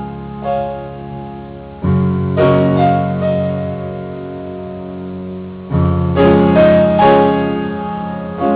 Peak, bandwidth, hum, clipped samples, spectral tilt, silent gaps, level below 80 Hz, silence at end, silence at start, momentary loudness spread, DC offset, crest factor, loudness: -2 dBFS; 4 kHz; none; under 0.1%; -12 dB/octave; none; -32 dBFS; 0 s; 0 s; 17 LU; under 0.1%; 14 dB; -14 LUFS